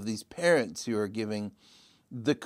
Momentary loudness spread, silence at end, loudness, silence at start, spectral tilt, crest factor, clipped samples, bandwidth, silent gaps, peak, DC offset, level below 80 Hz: 13 LU; 0 s; -30 LUFS; 0 s; -5 dB/octave; 20 dB; under 0.1%; 16 kHz; none; -12 dBFS; under 0.1%; -72 dBFS